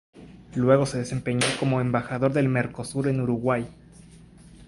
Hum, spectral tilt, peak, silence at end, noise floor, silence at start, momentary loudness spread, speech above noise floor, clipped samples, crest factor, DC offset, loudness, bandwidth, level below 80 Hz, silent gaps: none; -6 dB/octave; -6 dBFS; 0 s; -49 dBFS; 0.15 s; 8 LU; 25 dB; under 0.1%; 20 dB; under 0.1%; -25 LUFS; 11.5 kHz; -54 dBFS; none